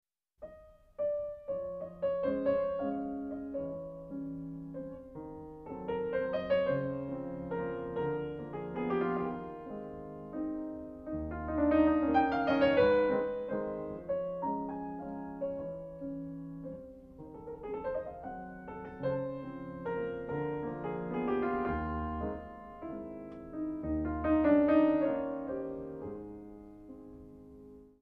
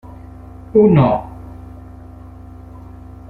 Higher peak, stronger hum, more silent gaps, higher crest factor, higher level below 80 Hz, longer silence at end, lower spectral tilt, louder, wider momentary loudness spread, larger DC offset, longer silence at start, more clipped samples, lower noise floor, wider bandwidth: second, -16 dBFS vs -2 dBFS; neither; neither; about the same, 20 dB vs 18 dB; second, -54 dBFS vs -40 dBFS; second, 0.15 s vs 0.5 s; second, -9.5 dB/octave vs -11 dB/octave; second, -34 LUFS vs -14 LUFS; second, 19 LU vs 26 LU; neither; second, 0.4 s vs 0.75 s; neither; first, -56 dBFS vs -36 dBFS; first, 5.4 kHz vs 4.4 kHz